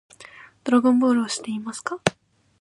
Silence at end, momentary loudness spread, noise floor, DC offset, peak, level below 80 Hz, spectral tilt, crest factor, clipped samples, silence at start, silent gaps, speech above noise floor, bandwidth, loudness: 0.5 s; 13 LU; -47 dBFS; under 0.1%; -2 dBFS; -62 dBFS; -4.5 dB/octave; 22 dB; under 0.1%; 0.2 s; none; 26 dB; 11 kHz; -22 LUFS